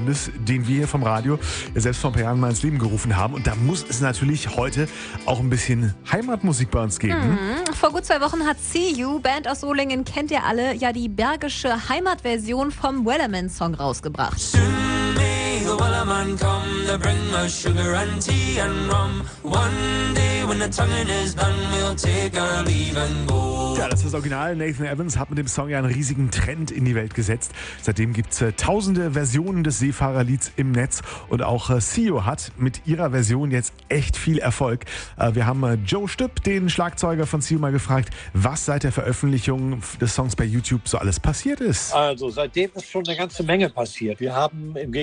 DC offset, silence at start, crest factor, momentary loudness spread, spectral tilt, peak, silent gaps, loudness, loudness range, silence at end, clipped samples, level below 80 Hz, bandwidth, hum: under 0.1%; 0 s; 18 dB; 4 LU; -5 dB/octave; -4 dBFS; none; -22 LUFS; 2 LU; 0 s; under 0.1%; -36 dBFS; 10 kHz; none